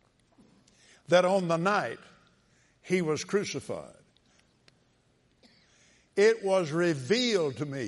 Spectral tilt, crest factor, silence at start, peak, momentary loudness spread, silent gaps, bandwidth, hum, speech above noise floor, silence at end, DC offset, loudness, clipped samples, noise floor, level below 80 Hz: -5 dB/octave; 20 dB; 1.1 s; -10 dBFS; 13 LU; none; 11.5 kHz; none; 41 dB; 0 s; under 0.1%; -28 LUFS; under 0.1%; -68 dBFS; -74 dBFS